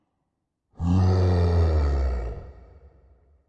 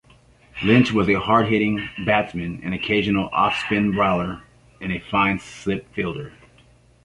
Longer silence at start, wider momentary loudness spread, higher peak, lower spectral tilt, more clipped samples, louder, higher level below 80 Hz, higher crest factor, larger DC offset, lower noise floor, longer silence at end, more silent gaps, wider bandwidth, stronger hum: first, 0.8 s vs 0.55 s; about the same, 13 LU vs 12 LU; second, -12 dBFS vs -2 dBFS; first, -9 dB/octave vs -6.5 dB/octave; neither; about the same, -23 LUFS vs -21 LUFS; first, -32 dBFS vs -46 dBFS; second, 12 dB vs 20 dB; neither; first, -78 dBFS vs -53 dBFS; first, 0.95 s vs 0.75 s; neither; second, 7 kHz vs 11 kHz; neither